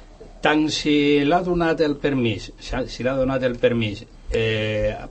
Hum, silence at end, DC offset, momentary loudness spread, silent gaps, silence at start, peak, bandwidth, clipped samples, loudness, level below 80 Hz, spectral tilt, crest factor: none; 0 s; under 0.1%; 10 LU; none; 0 s; -4 dBFS; 8.6 kHz; under 0.1%; -21 LUFS; -38 dBFS; -5.5 dB/octave; 18 dB